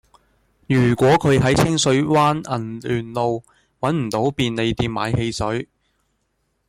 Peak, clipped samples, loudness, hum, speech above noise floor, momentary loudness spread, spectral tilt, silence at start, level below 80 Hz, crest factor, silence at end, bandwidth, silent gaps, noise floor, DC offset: -6 dBFS; under 0.1%; -19 LUFS; none; 51 dB; 10 LU; -5.5 dB/octave; 0.7 s; -44 dBFS; 14 dB; 1.05 s; 16 kHz; none; -70 dBFS; under 0.1%